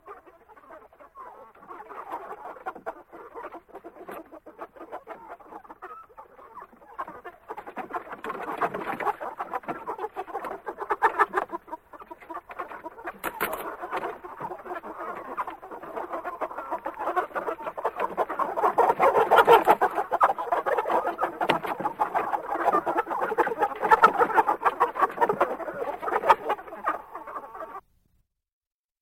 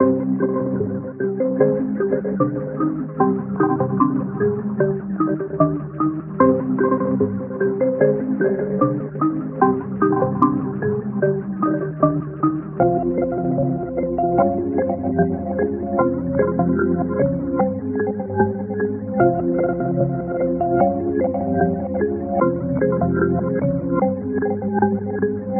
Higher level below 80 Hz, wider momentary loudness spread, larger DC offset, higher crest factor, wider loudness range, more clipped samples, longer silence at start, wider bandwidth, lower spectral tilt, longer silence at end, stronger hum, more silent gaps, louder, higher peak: second, -64 dBFS vs -46 dBFS; first, 22 LU vs 5 LU; neither; first, 24 dB vs 18 dB; first, 19 LU vs 1 LU; neither; about the same, 0.05 s vs 0 s; first, 16.5 kHz vs 2.9 kHz; about the same, -4.5 dB/octave vs -5.5 dB/octave; first, 1.2 s vs 0 s; neither; neither; second, -26 LUFS vs -20 LUFS; second, -4 dBFS vs 0 dBFS